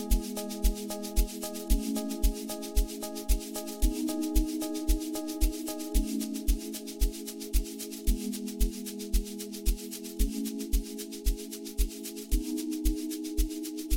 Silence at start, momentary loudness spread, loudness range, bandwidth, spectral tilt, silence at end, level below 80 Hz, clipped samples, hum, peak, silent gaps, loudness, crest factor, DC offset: 0 s; 6 LU; 2 LU; 17 kHz; -5 dB/octave; 0 s; -32 dBFS; under 0.1%; none; -12 dBFS; none; -33 LUFS; 18 dB; under 0.1%